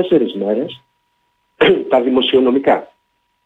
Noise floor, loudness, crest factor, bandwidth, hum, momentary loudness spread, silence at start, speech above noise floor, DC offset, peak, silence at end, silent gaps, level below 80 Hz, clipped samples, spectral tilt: -66 dBFS; -15 LUFS; 14 dB; 4.2 kHz; none; 7 LU; 0 s; 52 dB; under 0.1%; -2 dBFS; 0.6 s; none; -56 dBFS; under 0.1%; -7 dB/octave